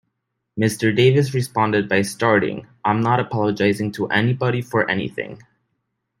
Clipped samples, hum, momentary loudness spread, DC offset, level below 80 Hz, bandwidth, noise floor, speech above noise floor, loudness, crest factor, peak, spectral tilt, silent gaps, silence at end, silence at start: under 0.1%; none; 9 LU; under 0.1%; -58 dBFS; 16 kHz; -76 dBFS; 57 dB; -19 LUFS; 18 dB; -2 dBFS; -6 dB/octave; none; 0.85 s; 0.55 s